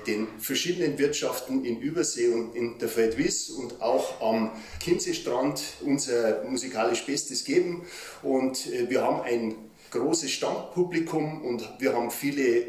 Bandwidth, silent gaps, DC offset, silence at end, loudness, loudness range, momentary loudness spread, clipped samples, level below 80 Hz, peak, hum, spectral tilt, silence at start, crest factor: 15.5 kHz; none; under 0.1%; 0 s; -28 LUFS; 1 LU; 6 LU; under 0.1%; -60 dBFS; -10 dBFS; none; -3.5 dB/octave; 0 s; 16 dB